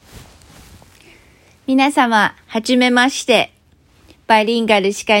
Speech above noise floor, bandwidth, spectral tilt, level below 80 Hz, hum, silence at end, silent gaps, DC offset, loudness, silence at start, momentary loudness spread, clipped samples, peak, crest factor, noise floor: 37 dB; 16.5 kHz; -3.5 dB/octave; -54 dBFS; none; 0 s; none; under 0.1%; -15 LUFS; 0.15 s; 6 LU; under 0.1%; 0 dBFS; 16 dB; -52 dBFS